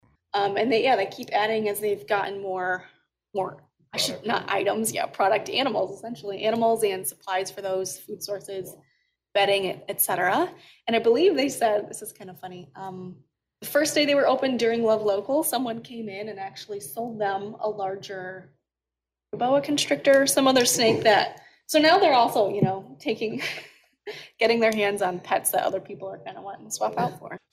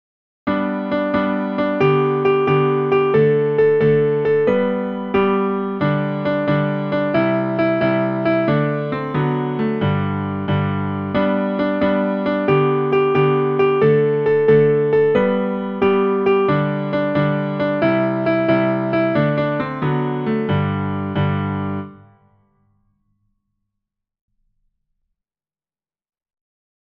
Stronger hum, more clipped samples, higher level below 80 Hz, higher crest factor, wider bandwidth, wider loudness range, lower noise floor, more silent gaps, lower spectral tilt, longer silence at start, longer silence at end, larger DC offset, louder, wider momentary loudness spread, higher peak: neither; neither; second, -70 dBFS vs -54 dBFS; about the same, 16 dB vs 16 dB; first, 16 kHz vs 5.6 kHz; about the same, 7 LU vs 6 LU; about the same, -89 dBFS vs under -90 dBFS; neither; second, -3 dB/octave vs -10 dB/octave; about the same, 0.35 s vs 0.45 s; second, 0.15 s vs 4.85 s; neither; second, -24 LUFS vs -18 LUFS; first, 18 LU vs 6 LU; second, -8 dBFS vs -2 dBFS